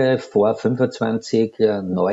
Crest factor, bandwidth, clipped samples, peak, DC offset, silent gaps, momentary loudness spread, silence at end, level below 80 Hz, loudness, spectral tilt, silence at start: 14 dB; 8 kHz; under 0.1%; -4 dBFS; under 0.1%; none; 3 LU; 0 s; -64 dBFS; -20 LUFS; -7 dB/octave; 0 s